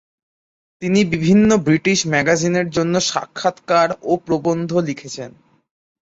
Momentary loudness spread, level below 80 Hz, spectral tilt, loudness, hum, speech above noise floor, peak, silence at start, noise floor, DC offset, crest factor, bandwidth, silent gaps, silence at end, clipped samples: 12 LU; -52 dBFS; -5 dB/octave; -17 LUFS; none; over 73 dB; -2 dBFS; 0.8 s; under -90 dBFS; under 0.1%; 16 dB; 8 kHz; none; 0.7 s; under 0.1%